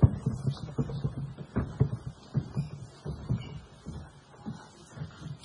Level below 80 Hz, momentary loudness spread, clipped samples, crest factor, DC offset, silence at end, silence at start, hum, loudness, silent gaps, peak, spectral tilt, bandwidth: -46 dBFS; 14 LU; under 0.1%; 26 dB; under 0.1%; 0 s; 0 s; none; -35 LUFS; none; -8 dBFS; -8.5 dB/octave; 10.5 kHz